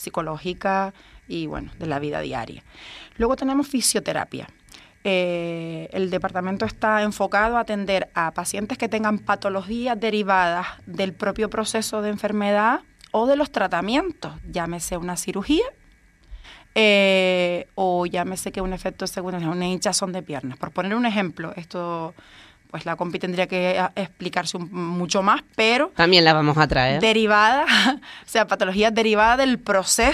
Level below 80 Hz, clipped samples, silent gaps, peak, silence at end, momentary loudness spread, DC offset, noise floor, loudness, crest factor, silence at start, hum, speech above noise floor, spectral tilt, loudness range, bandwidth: -46 dBFS; under 0.1%; none; 0 dBFS; 0 s; 14 LU; under 0.1%; -54 dBFS; -22 LUFS; 22 dB; 0 s; none; 32 dB; -4 dB/octave; 9 LU; 14.5 kHz